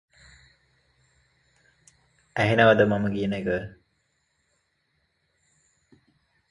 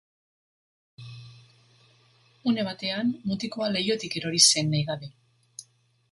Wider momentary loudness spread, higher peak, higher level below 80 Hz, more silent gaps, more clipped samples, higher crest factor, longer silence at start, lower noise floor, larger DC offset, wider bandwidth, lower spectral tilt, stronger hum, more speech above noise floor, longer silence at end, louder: second, 15 LU vs 28 LU; about the same, -4 dBFS vs -4 dBFS; first, -56 dBFS vs -66 dBFS; neither; neither; about the same, 24 dB vs 26 dB; first, 2.35 s vs 1 s; first, -73 dBFS vs -62 dBFS; neither; about the same, 11 kHz vs 11.5 kHz; first, -7 dB/octave vs -3 dB/octave; neither; first, 51 dB vs 36 dB; first, 2.8 s vs 0.5 s; about the same, -23 LUFS vs -25 LUFS